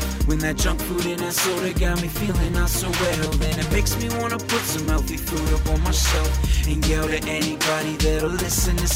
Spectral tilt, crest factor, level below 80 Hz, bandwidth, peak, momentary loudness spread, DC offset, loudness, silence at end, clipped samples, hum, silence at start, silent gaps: -4 dB/octave; 12 dB; -24 dBFS; 16.5 kHz; -8 dBFS; 3 LU; under 0.1%; -22 LUFS; 0 s; under 0.1%; none; 0 s; none